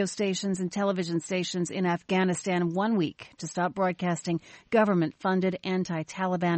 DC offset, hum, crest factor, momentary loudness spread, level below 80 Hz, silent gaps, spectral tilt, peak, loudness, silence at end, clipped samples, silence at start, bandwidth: under 0.1%; none; 16 dB; 5 LU; -68 dBFS; none; -5.5 dB/octave; -12 dBFS; -28 LUFS; 0 s; under 0.1%; 0 s; 8.8 kHz